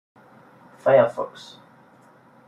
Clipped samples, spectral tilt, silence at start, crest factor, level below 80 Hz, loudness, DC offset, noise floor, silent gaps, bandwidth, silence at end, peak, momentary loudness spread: under 0.1%; -6.5 dB/octave; 0.85 s; 22 dB; -74 dBFS; -21 LUFS; under 0.1%; -53 dBFS; none; 10 kHz; 1.2 s; -4 dBFS; 25 LU